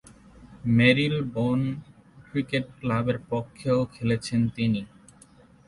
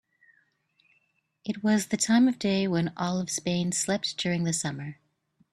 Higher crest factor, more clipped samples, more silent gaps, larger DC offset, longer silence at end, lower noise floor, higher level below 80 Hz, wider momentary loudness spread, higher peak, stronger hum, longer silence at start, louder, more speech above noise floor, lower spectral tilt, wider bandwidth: about the same, 20 dB vs 18 dB; neither; neither; neither; first, 0.8 s vs 0.6 s; second, -54 dBFS vs -72 dBFS; first, -54 dBFS vs -66 dBFS; about the same, 12 LU vs 12 LU; first, -6 dBFS vs -10 dBFS; neither; second, 0.4 s vs 1.45 s; about the same, -26 LUFS vs -27 LUFS; second, 29 dB vs 45 dB; first, -7 dB/octave vs -4.5 dB/octave; second, 11.5 kHz vs 14 kHz